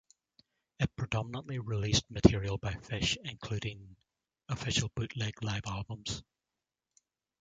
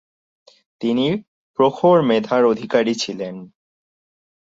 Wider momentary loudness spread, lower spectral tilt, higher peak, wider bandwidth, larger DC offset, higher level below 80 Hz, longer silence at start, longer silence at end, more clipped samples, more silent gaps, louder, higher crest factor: about the same, 13 LU vs 15 LU; about the same, -5 dB/octave vs -5.5 dB/octave; about the same, -6 dBFS vs -4 dBFS; first, 9.4 kHz vs 8 kHz; neither; first, -50 dBFS vs -64 dBFS; about the same, 0.8 s vs 0.8 s; first, 1.2 s vs 1.05 s; neither; second, none vs 1.28-1.54 s; second, -34 LUFS vs -18 LUFS; first, 30 dB vs 18 dB